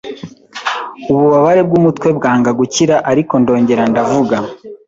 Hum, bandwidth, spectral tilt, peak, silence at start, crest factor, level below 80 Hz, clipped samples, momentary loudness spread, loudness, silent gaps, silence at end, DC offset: none; 8 kHz; -6 dB/octave; -2 dBFS; 0.05 s; 12 dB; -50 dBFS; under 0.1%; 12 LU; -12 LUFS; none; 0.1 s; under 0.1%